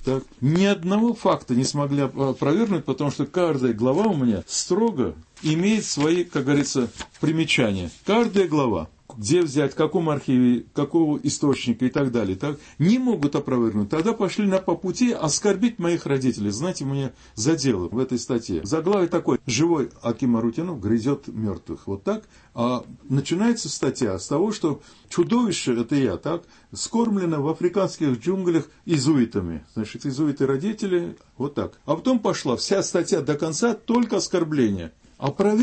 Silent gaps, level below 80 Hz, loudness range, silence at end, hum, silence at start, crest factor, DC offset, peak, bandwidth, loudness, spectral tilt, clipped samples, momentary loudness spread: none; -54 dBFS; 3 LU; 0 s; none; 0 s; 14 dB; under 0.1%; -8 dBFS; 8.8 kHz; -23 LUFS; -5.5 dB/octave; under 0.1%; 8 LU